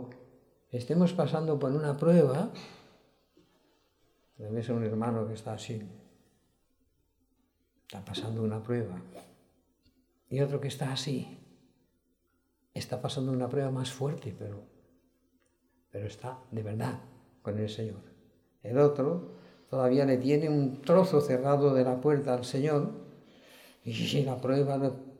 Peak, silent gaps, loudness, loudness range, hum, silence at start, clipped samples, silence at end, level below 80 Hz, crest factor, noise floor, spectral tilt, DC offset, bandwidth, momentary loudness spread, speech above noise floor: -12 dBFS; none; -30 LUFS; 12 LU; none; 0 s; under 0.1%; 0.05 s; -72 dBFS; 20 dB; -74 dBFS; -7 dB/octave; under 0.1%; 15 kHz; 20 LU; 45 dB